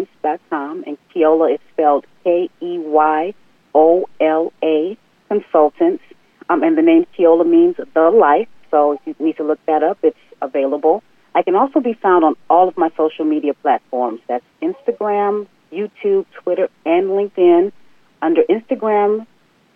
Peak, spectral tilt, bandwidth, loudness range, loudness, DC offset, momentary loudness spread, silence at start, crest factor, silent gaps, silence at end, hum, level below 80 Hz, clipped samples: -2 dBFS; -8.5 dB/octave; 3.6 kHz; 5 LU; -16 LUFS; under 0.1%; 11 LU; 0 s; 14 dB; none; 0.5 s; none; -70 dBFS; under 0.1%